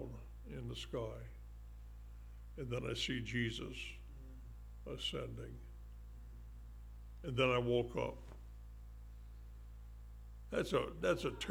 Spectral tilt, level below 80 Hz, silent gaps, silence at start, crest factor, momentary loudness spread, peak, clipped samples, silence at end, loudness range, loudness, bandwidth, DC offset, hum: -5.5 dB/octave; -52 dBFS; none; 0 s; 22 dB; 19 LU; -20 dBFS; under 0.1%; 0 s; 7 LU; -40 LUFS; 17.5 kHz; under 0.1%; none